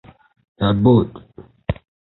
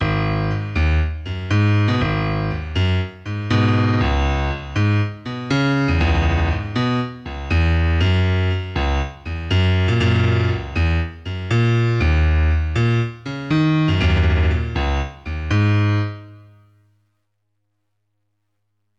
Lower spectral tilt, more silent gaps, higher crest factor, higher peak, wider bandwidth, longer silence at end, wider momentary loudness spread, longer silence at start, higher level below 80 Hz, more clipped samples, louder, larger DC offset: first, -12 dB/octave vs -7 dB/octave; neither; first, 20 dB vs 12 dB; first, 0 dBFS vs -6 dBFS; second, 4.2 kHz vs 7.4 kHz; second, 0.45 s vs 2.6 s; first, 16 LU vs 8 LU; first, 0.6 s vs 0 s; second, -40 dBFS vs -26 dBFS; neither; about the same, -18 LUFS vs -19 LUFS; neither